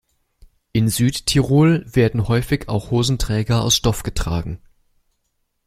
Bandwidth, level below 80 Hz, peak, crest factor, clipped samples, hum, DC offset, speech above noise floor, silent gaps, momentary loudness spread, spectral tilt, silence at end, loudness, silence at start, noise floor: 16 kHz; -34 dBFS; -2 dBFS; 16 dB; under 0.1%; none; under 0.1%; 53 dB; none; 9 LU; -5 dB/octave; 1.1 s; -19 LUFS; 0.75 s; -70 dBFS